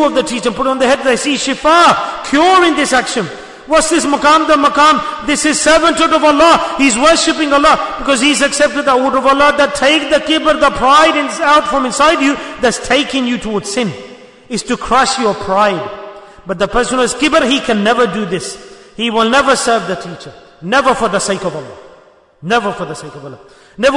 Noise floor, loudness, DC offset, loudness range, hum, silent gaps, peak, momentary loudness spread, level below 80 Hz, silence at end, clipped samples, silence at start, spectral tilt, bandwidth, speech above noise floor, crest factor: -44 dBFS; -11 LUFS; under 0.1%; 6 LU; none; none; 0 dBFS; 13 LU; -40 dBFS; 0 s; under 0.1%; 0 s; -3 dB/octave; 11 kHz; 32 dB; 12 dB